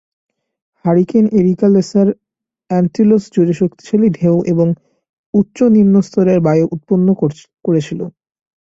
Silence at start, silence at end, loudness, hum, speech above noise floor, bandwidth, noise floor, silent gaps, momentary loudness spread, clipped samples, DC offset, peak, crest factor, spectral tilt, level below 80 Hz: 0.85 s; 0.65 s; -14 LUFS; none; 31 dB; 7.8 kHz; -44 dBFS; 5.09-5.33 s; 8 LU; under 0.1%; under 0.1%; 0 dBFS; 12 dB; -9 dB/octave; -52 dBFS